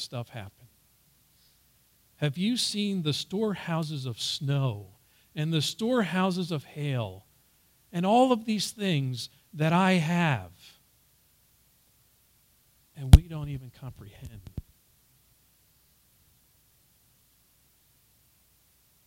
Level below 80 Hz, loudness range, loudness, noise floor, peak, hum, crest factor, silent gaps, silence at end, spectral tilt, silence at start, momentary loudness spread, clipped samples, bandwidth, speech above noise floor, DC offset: -36 dBFS; 6 LU; -27 LUFS; -65 dBFS; 0 dBFS; none; 30 dB; none; 4.45 s; -5.5 dB/octave; 0 s; 21 LU; under 0.1%; 16 kHz; 38 dB; under 0.1%